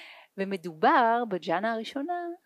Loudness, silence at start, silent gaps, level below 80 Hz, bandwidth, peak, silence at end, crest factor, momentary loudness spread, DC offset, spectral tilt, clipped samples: -27 LUFS; 0 s; none; -86 dBFS; 13 kHz; -10 dBFS; 0.1 s; 18 dB; 12 LU; under 0.1%; -6 dB/octave; under 0.1%